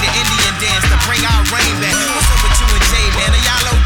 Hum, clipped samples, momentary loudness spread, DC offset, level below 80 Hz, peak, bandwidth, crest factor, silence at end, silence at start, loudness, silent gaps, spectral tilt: none; under 0.1%; 1 LU; under 0.1%; -16 dBFS; 0 dBFS; 19 kHz; 12 dB; 0 s; 0 s; -12 LUFS; none; -2.5 dB/octave